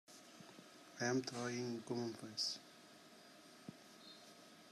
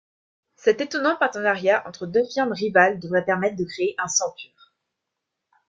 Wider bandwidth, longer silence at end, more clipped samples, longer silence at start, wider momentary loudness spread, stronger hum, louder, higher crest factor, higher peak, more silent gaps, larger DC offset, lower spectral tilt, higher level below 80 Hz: first, 14.5 kHz vs 9.4 kHz; second, 0 s vs 1.25 s; neither; second, 0.1 s vs 0.65 s; first, 20 LU vs 7 LU; neither; second, -43 LUFS vs -22 LUFS; about the same, 20 dB vs 20 dB; second, -26 dBFS vs -4 dBFS; neither; neither; about the same, -3.5 dB/octave vs -3.5 dB/octave; second, under -90 dBFS vs -68 dBFS